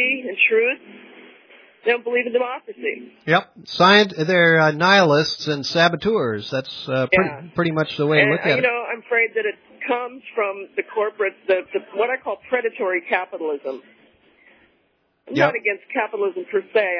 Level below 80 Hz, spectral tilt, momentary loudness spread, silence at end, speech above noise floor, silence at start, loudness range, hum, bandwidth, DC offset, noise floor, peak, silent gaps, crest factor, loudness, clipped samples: -62 dBFS; -5 dB/octave; 13 LU; 0 s; 45 dB; 0 s; 8 LU; none; 5.4 kHz; under 0.1%; -65 dBFS; -2 dBFS; none; 20 dB; -20 LUFS; under 0.1%